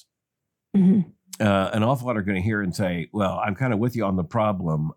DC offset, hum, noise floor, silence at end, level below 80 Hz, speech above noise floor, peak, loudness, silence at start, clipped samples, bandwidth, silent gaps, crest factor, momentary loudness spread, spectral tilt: under 0.1%; none; -83 dBFS; 0.05 s; -60 dBFS; 61 dB; -6 dBFS; -23 LUFS; 0.75 s; under 0.1%; 15 kHz; none; 16 dB; 6 LU; -7.5 dB/octave